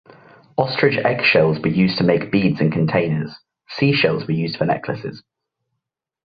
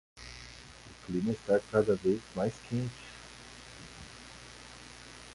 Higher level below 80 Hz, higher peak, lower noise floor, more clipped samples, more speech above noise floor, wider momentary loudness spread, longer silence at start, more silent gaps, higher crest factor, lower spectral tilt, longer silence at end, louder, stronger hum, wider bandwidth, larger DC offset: about the same, -54 dBFS vs -58 dBFS; first, -2 dBFS vs -12 dBFS; first, -80 dBFS vs -52 dBFS; neither; first, 62 dB vs 21 dB; second, 12 LU vs 20 LU; first, 0.6 s vs 0.15 s; neither; about the same, 18 dB vs 22 dB; first, -8.5 dB/octave vs -6 dB/octave; first, 1.15 s vs 0 s; first, -18 LUFS vs -32 LUFS; neither; second, 6.2 kHz vs 11.5 kHz; neither